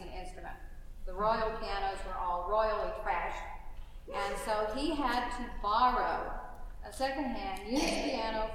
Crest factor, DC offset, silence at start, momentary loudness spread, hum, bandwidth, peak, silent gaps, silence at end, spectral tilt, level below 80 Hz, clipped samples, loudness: 18 dB; under 0.1%; 0 s; 17 LU; none; 15.5 kHz; -16 dBFS; none; 0 s; -4 dB/octave; -44 dBFS; under 0.1%; -34 LUFS